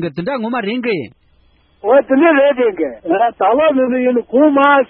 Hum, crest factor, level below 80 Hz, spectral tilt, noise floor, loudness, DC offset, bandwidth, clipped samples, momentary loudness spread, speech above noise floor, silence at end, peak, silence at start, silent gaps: none; 14 dB; -56 dBFS; -9 dB/octave; -53 dBFS; -14 LUFS; under 0.1%; 4.5 kHz; under 0.1%; 10 LU; 40 dB; 0.05 s; 0 dBFS; 0 s; none